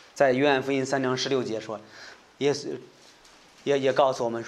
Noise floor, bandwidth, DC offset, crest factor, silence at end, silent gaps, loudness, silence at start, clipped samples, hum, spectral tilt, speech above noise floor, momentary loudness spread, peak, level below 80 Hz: -54 dBFS; 12 kHz; under 0.1%; 20 dB; 0 s; none; -25 LUFS; 0.15 s; under 0.1%; none; -4.5 dB/octave; 29 dB; 17 LU; -6 dBFS; -72 dBFS